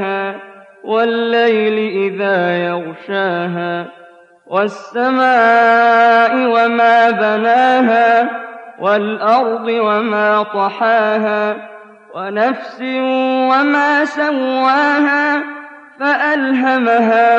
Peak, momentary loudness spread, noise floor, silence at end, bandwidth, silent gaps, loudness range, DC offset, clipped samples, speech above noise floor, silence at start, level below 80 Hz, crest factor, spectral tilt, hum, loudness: -4 dBFS; 11 LU; -43 dBFS; 0 s; 7.8 kHz; none; 5 LU; under 0.1%; under 0.1%; 29 dB; 0 s; -70 dBFS; 10 dB; -6 dB/octave; none; -14 LUFS